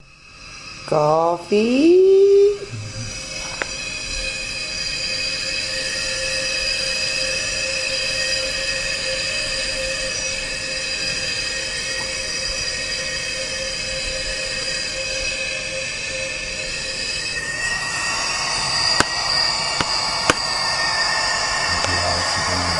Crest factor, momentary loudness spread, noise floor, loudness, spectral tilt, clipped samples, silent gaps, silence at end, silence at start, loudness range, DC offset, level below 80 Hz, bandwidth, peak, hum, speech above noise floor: 22 dB; 7 LU; -42 dBFS; -20 LUFS; -2 dB/octave; under 0.1%; none; 0 s; 0.25 s; 5 LU; under 0.1%; -42 dBFS; 11.5 kHz; 0 dBFS; none; 27 dB